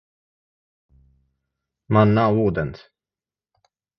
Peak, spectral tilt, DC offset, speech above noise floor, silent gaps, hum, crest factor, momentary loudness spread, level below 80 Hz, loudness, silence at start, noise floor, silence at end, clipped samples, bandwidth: -2 dBFS; -10 dB/octave; under 0.1%; over 72 dB; none; none; 22 dB; 11 LU; -48 dBFS; -19 LUFS; 1.9 s; under -90 dBFS; 1.2 s; under 0.1%; 5.8 kHz